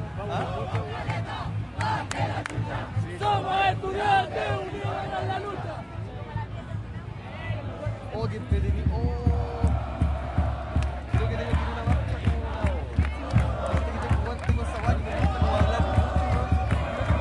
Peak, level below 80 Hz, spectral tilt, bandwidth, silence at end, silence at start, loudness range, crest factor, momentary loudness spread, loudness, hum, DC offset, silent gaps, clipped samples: -10 dBFS; -32 dBFS; -7 dB/octave; 11 kHz; 0 s; 0 s; 6 LU; 18 dB; 10 LU; -28 LUFS; none; under 0.1%; none; under 0.1%